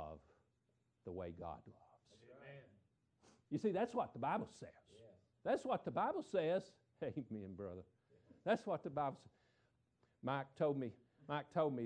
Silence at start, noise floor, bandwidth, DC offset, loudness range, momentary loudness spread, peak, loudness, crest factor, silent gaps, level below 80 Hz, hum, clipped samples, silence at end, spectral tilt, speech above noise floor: 0 s; -82 dBFS; 9.6 kHz; under 0.1%; 5 LU; 19 LU; -26 dBFS; -43 LUFS; 20 dB; none; -76 dBFS; none; under 0.1%; 0 s; -7 dB/octave; 40 dB